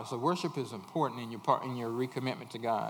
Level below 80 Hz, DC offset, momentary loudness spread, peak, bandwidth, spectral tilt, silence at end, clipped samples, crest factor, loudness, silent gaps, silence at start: -86 dBFS; under 0.1%; 6 LU; -12 dBFS; over 20 kHz; -6 dB/octave; 0 s; under 0.1%; 22 dB; -34 LUFS; none; 0 s